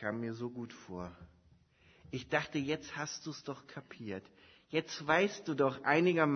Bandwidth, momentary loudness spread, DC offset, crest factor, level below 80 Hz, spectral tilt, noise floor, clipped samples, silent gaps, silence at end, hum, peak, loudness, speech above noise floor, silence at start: 6.4 kHz; 17 LU; under 0.1%; 22 dB; -70 dBFS; -4 dB/octave; -67 dBFS; under 0.1%; none; 0 s; none; -14 dBFS; -35 LUFS; 31 dB; 0 s